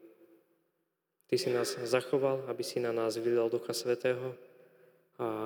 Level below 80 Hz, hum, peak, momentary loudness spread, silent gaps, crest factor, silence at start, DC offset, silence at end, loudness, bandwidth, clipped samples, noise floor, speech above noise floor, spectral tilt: under -90 dBFS; none; -14 dBFS; 7 LU; none; 20 dB; 0.05 s; under 0.1%; 0 s; -33 LUFS; over 20 kHz; under 0.1%; -82 dBFS; 50 dB; -4.5 dB/octave